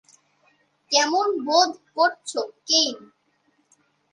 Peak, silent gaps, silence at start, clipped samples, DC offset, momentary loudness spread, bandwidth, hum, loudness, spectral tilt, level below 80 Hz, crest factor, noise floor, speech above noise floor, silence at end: -6 dBFS; none; 0.9 s; under 0.1%; under 0.1%; 10 LU; 11.5 kHz; none; -21 LUFS; 0.5 dB/octave; -82 dBFS; 20 dB; -67 dBFS; 45 dB; 1.15 s